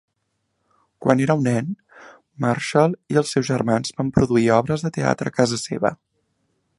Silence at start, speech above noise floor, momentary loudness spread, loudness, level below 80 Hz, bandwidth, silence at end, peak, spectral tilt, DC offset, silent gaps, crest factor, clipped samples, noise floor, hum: 1 s; 54 dB; 7 LU; -21 LUFS; -50 dBFS; 11.5 kHz; 0.85 s; 0 dBFS; -6 dB/octave; under 0.1%; none; 22 dB; under 0.1%; -73 dBFS; none